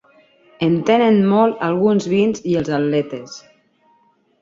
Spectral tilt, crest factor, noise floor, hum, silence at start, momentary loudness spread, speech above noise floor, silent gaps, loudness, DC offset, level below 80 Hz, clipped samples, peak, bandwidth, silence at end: -7 dB/octave; 16 dB; -58 dBFS; none; 0.6 s; 14 LU; 42 dB; none; -17 LUFS; under 0.1%; -56 dBFS; under 0.1%; -2 dBFS; 7.6 kHz; 1 s